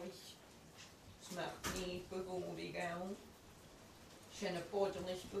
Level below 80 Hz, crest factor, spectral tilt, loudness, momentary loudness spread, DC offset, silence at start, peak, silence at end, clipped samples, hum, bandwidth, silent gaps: -66 dBFS; 20 dB; -4 dB/octave; -45 LUFS; 19 LU; under 0.1%; 0 s; -26 dBFS; 0 s; under 0.1%; none; 15 kHz; none